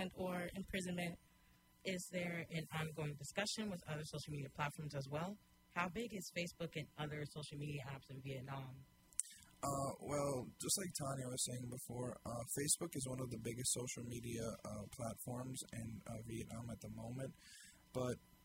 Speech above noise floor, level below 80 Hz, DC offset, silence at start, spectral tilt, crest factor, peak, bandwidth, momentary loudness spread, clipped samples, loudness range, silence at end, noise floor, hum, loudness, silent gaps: 26 dB; -68 dBFS; under 0.1%; 0 s; -4 dB/octave; 30 dB; -16 dBFS; 16 kHz; 10 LU; under 0.1%; 6 LU; 0 s; -71 dBFS; none; -45 LUFS; none